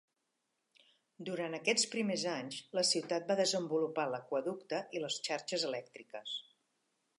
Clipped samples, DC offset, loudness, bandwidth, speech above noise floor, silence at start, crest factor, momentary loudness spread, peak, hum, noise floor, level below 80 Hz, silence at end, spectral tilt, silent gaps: under 0.1%; under 0.1%; -36 LUFS; 11.5 kHz; 48 dB; 1.2 s; 20 dB; 11 LU; -18 dBFS; none; -84 dBFS; under -90 dBFS; 0.8 s; -2.5 dB/octave; none